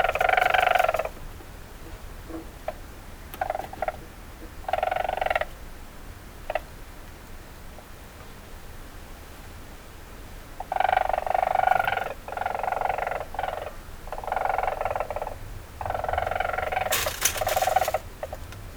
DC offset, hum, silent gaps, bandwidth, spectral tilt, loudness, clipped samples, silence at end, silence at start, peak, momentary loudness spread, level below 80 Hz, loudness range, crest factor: under 0.1%; none; none; over 20 kHz; -2.5 dB/octave; -27 LUFS; under 0.1%; 0 s; 0 s; -4 dBFS; 21 LU; -42 dBFS; 14 LU; 24 dB